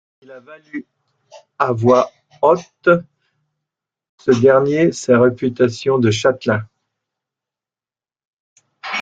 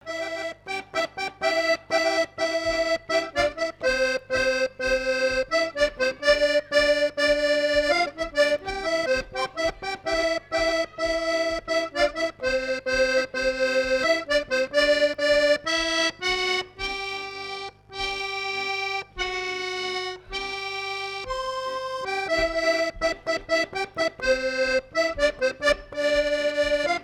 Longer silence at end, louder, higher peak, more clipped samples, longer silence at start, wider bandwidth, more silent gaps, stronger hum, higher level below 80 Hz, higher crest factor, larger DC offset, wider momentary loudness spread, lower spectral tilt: about the same, 0 s vs 0 s; first, -16 LUFS vs -24 LUFS; first, 0 dBFS vs -8 dBFS; neither; first, 0.3 s vs 0.05 s; second, 9 kHz vs 15 kHz; first, 4.09-4.18 s, 8.27-8.56 s vs none; second, none vs 50 Hz at -60 dBFS; second, -58 dBFS vs -48 dBFS; about the same, 18 dB vs 18 dB; neither; first, 13 LU vs 9 LU; first, -6 dB/octave vs -2 dB/octave